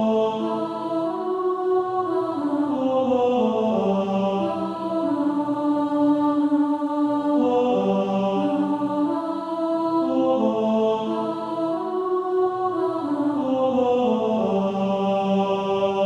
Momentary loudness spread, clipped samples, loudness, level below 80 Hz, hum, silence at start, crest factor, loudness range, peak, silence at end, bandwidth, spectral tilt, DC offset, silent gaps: 5 LU; under 0.1%; -23 LUFS; -64 dBFS; none; 0 s; 12 dB; 2 LU; -10 dBFS; 0 s; 8.2 kHz; -8 dB/octave; under 0.1%; none